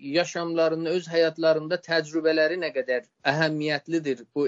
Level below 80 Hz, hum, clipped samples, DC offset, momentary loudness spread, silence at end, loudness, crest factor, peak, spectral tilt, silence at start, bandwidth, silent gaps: -76 dBFS; none; under 0.1%; under 0.1%; 6 LU; 0 s; -25 LUFS; 18 dB; -6 dBFS; -3.5 dB/octave; 0 s; 7.8 kHz; none